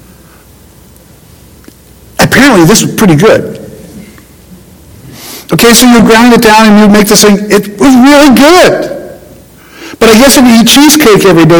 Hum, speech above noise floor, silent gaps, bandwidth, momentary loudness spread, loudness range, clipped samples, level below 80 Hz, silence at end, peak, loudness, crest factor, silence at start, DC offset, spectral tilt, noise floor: none; 33 dB; none; over 20 kHz; 12 LU; 5 LU; 30%; -32 dBFS; 0 s; 0 dBFS; -3 LUFS; 4 dB; 2.2 s; under 0.1%; -4 dB/octave; -36 dBFS